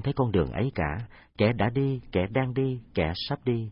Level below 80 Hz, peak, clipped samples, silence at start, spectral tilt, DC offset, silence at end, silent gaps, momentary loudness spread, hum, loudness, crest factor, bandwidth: -46 dBFS; -10 dBFS; under 0.1%; 0 s; -11.5 dB/octave; under 0.1%; 0 s; none; 5 LU; none; -28 LUFS; 16 dB; 5.6 kHz